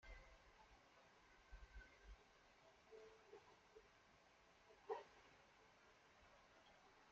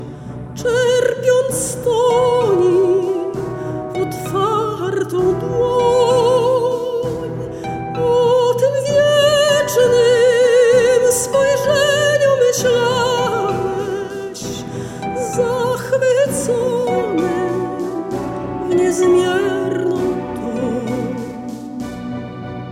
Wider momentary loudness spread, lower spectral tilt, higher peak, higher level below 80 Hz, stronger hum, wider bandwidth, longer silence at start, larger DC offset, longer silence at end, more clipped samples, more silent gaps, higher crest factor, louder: about the same, 15 LU vs 13 LU; second, -2.5 dB/octave vs -4.5 dB/octave; second, -36 dBFS vs -2 dBFS; second, -72 dBFS vs -46 dBFS; neither; second, 7.4 kHz vs 16.5 kHz; about the same, 0 s vs 0 s; neither; about the same, 0 s vs 0 s; neither; neither; first, 28 dB vs 14 dB; second, -63 LUFS vs -16 LUFS